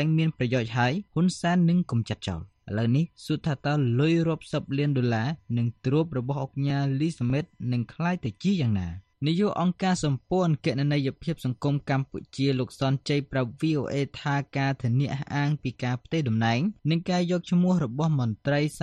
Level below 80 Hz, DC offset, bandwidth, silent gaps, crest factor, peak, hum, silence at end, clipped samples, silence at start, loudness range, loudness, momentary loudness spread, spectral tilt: -56 dBFS; under 0.1%; 10.5 kHz; none; 14 dB; -12 dBFS; none; 0 s; under 0.1%; 0 s; 2 LU; -27 LUFS; 6 LU; -7 dB/octave